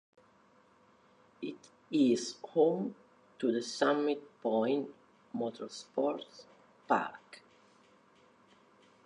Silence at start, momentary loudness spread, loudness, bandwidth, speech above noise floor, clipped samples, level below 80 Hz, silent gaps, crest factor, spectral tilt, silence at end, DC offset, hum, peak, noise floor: 1.4 s; 16 LU; -34 LUFS; 11 kHz; 33 dB; under 0.1%; -86 dBFS; none; 22 dB; -5 dB/octave; 1.65 s; under 0.1%; none; -14 dBFS; -65 dBFS